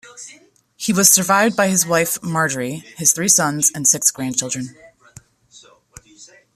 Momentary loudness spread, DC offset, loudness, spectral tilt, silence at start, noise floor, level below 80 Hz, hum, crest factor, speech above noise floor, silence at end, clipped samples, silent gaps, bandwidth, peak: 15 LU; under 0.1%; -15 LUFS; -2.5 dB/octave; 0.05 s; -49 dBFS; -60 dBFS; none; 20 dB; 31 dB; 0.3 s; under 0.1%; none; 15 kHz; 0 dBFS